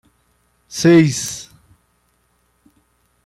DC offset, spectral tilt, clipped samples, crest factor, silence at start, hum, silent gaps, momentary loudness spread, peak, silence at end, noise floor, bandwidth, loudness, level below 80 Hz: under 0.1%; -5.5 dB/octave; under 0.1%; 18 dB; 0.7 s; 60 Hz at -55 dBFS; none; 19 LU; -2 dBFS; 1.85 s; -63 dBFS; 16.5 kHz; -15 LUFS; -56 dBFS